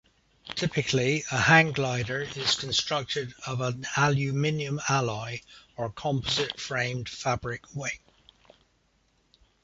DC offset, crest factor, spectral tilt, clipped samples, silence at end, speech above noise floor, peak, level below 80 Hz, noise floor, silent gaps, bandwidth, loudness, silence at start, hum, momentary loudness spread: under 0.1%; 24 dB; -4 dB/octave; under 0.1%; 1.65 s; 41 dB; -4 dBFS; -56 dBFS; -68 dBFS; none; 8 kHz; -27 LUFS; 0.45 s; none; 12 LU